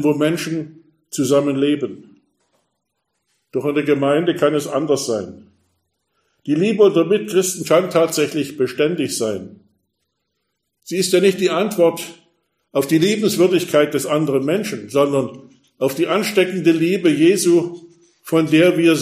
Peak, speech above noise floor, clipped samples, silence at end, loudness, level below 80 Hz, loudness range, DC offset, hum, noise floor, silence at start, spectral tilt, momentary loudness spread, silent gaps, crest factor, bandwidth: 0 dBFS; 57 dB; under 0.1%; 0 s; -17 LUFS; -66 dBFS; 4 LU; under 0.1%; none; -74 dBFS; 0 s; -5 dB/octave; 11 LU; none; 18 dB; 15.5 kHz